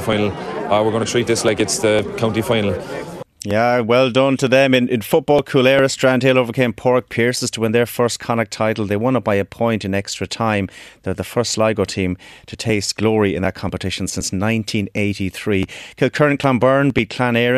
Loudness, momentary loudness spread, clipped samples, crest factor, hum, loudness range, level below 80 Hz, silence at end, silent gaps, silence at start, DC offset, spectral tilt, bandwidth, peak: -18 LUFS; 9 LU; under 0.1%; 18 dB; none; 5 LU; -48 dBFS; 0 s; none; 0 s; under 0.1%; -5 dB/octave; 14 kHz; 0 dBFS